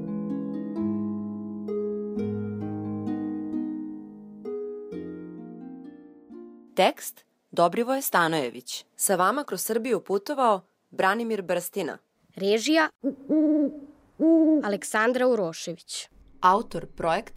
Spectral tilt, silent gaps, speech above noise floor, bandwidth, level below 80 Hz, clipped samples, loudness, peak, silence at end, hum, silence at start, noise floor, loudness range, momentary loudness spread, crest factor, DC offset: -4 dB/octave; 12.95-12.99 s; 22 dB; 16 kHz; -62 dBFS; under 0.1%; -26 LUFS; -6 dBFS; 0 s; none; 0 s; -46 dBFS; 9 LU; 18 LU; 20 dB; under 0.1%